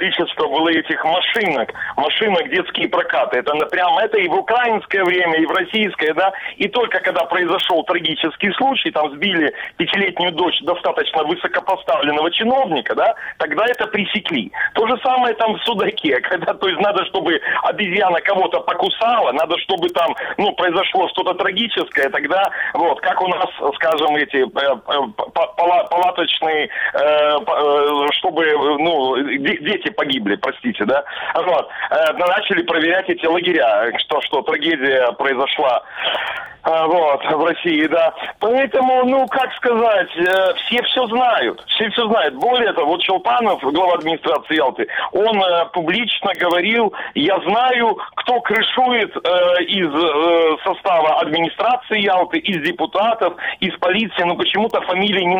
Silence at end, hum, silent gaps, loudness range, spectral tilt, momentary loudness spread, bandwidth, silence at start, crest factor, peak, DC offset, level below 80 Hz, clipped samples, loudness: 0 s; none; none; 2 LU; -5.5 dB/octave; 4 LU; 20 kHz; 0 s; 14 dB; -2 dBFS; under 0.1%; -60 dBFS; under 0.1%; -17 LUFS